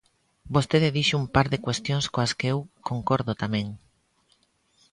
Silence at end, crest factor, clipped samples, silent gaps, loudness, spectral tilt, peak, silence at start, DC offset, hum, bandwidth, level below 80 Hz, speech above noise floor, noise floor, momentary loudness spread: 1.15 s; 22 dB; under 0.1%; none; -25 LUFS; -5.5 dB/octave; -6 dBFS; 0.45 s; under 0.1%; none; 11 kHz; -50 dBFS; 42 dB; -67 dBFS; 9 LU